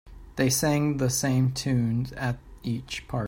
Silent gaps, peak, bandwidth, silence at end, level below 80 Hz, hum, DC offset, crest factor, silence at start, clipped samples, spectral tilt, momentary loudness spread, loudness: none; -10 dBFS; 16.5 kHz; 0 s; -48 dBFS; none; under 0.1%; 16 dB; 0.05 s; under 0.1%; -5 dB/octave; 10 LU; -26 LUFS